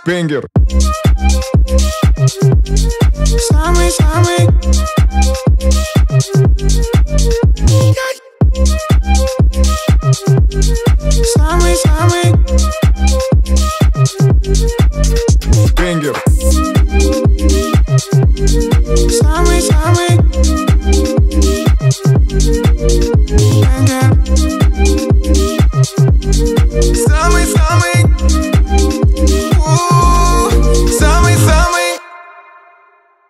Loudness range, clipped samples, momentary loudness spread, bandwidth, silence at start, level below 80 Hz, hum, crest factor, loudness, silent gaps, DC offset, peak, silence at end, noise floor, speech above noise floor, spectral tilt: 1 LU; under 0.1%; 3 LU; 15 kHz; 0.05 s; -12 dBFS; none; 10 dB; -12 LUFS; none; under 0.1%; 0 dBFS; 1.1 s; -49 dBFS; 39 dB; -5.5 dB/octave